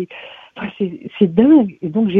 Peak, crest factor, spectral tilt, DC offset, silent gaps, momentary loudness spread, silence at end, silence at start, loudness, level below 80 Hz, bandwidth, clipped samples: 0 dBFS; 16 dB; -10.5 dB/octave; under 0.1%; none; 20 LU; 0 s; 0 s; -15 LUFS; -52 dBFS; 3.8 kHz; under 0.1%